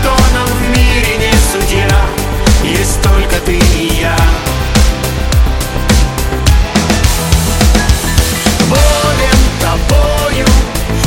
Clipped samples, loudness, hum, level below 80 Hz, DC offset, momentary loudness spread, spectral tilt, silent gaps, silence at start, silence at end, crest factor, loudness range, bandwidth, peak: 0.1%; -11 LUFS; none; -12 dBFS; under 0.1%; 3 LU; -4.5 dB/octave; none; 0 s; 0 s; 10 dB; 1 LU; 17.5 kHz; 0 dBFS